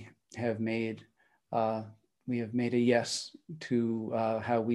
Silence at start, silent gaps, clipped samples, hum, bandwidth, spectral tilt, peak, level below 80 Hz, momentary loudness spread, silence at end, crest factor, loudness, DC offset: 0 s; none; under 0.1%; none; 12 kHz; -5.5 dB/octave; -14 dBFS; -76 dBFS; 17 LU; 0 s; 18 dB; -32 LUFS; under 0.1%